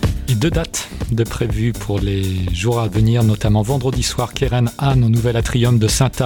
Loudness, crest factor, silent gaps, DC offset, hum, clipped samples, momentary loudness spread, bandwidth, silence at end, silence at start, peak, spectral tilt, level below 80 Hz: -17 LUFS; 14 dB; none; under 0.1%; none; under 0.1%; 6 LU; 18.5 kHz; 0 s; 0 s; -2 dBFS; -5.5 dB/octave; -28 dBFS